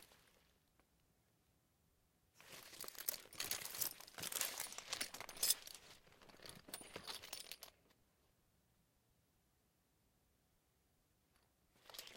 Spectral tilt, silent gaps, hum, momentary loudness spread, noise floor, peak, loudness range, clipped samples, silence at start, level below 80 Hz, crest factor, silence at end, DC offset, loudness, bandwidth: 0.5 dB/octave; none; none; 18 LU; -80 dBFS; -18 dBFS; 14 LU; under 0.1%; 0 s; -78 dBFS; 34 dB; 0 s; under 0.1%; -44 LUFS; 17 kHz